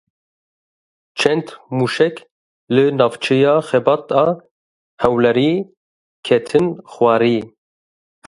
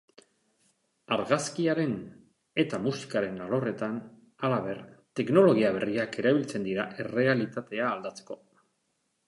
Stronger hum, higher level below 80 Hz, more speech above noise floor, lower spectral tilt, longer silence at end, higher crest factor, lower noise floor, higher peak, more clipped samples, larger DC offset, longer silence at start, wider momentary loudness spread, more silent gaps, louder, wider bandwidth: neither; first, -54 dBFS vs -70 dBFS; first, over 74 dB vs 49 dB; about the same, -6 dB/octave vs -6 dB/octave; second, 0.8 s vs 0.95 s; about the same, 18 dB vs 22 dB; first, under -90 dBFS vs -76 dBFS; first, 0 dBFS vs -8 dBFS; neither; neither; about the same, 1.15 s vs 1.1 s; second, 11 LU vs 14 LU; first, 2.31-2.67 s, 4.51-4.98 s, 5.77-6.23 s vs none; first, -17 LUFS vs -28 LUFS; about the same, 11.5 kHz vs 11.5 kHz